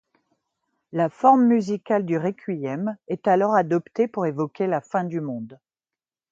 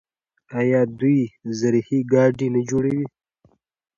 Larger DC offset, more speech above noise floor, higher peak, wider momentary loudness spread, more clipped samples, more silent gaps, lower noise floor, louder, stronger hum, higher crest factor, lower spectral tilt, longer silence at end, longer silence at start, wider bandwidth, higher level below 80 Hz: neither; first, over 68 dB vs 42 dB; about the same, -4 dBFS vs -4 dBFS; first, 12 LU vs 9 LU; neither; neither; first, under -90 dBFS vs -62 dBFS; about the same, -23 LUFS vs -21 LUFS; neither; about the same, 18 dB vs 18 dB; about the same, -8 dB/octave vs -7.5 dB/octave; second, 0.75 s vs 0.9 s; first, 0.95 s vs 0.5 s; about the same, 7.6 kHz vs 7.4 kHz; second, -74 dBFS vs -58 dBFS